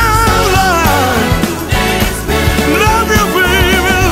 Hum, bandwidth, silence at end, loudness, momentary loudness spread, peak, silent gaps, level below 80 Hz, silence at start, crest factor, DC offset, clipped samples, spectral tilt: none; 16.5 kHz; 0 s; -11 LUFS; 4 LU; 0 dBFS; none; -20 dBFS; 0 s; 10 dB; under 0.1%; under 0.1%; -4 dB/octave